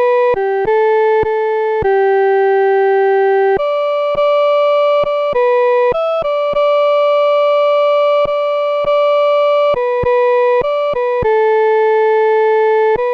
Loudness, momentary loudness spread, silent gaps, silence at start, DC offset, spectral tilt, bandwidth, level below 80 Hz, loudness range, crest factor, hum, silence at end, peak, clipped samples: -13 LUFS; 3 LU; none; 0 s; under 0.1%; -6 dB/octave; 6.2 kHz; -44 dBFS; 1 LU; 6 dB; none; 0 s; -6 dBFS; under 0.1%